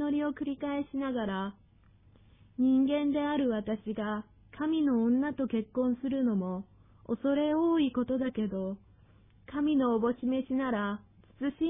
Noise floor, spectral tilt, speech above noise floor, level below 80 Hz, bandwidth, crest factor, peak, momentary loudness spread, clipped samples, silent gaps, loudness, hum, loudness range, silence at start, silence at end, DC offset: -61 dBFS; -10.5 dB/octave; 31 dB; -62 dBFS; 3.8 kHz; 12 dB; -18 dBFS; 11 LU; under 0.1%; none; -31 LUFS; none; 2 LU; 0 s; 0 s; under 0.1%